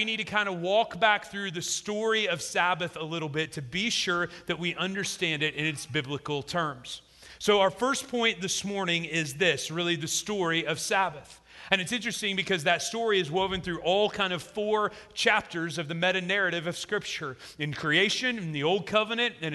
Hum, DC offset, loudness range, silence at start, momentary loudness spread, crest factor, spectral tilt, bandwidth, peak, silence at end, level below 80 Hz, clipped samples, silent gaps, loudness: none; under 0.1%; 2 LU; 0 s; 8 LU; 22 dB; -3 dB/octave; 12.5 kHz; -6 dBFS; 0 s; -62 dBFS; under 0.1%; none; -28 LUFS